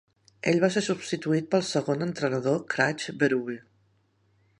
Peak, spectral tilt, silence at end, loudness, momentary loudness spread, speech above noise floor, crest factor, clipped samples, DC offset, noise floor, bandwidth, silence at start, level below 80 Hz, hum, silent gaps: -8 dBFS; -5 dB/octave; 1 s; -27 LUFS; 6 LU; 41 dB; 20 dB; under 0.1%; under 0.1%; -67 dBFS; 11.5 kHz; 0.45 s; -72 dBFS; none; none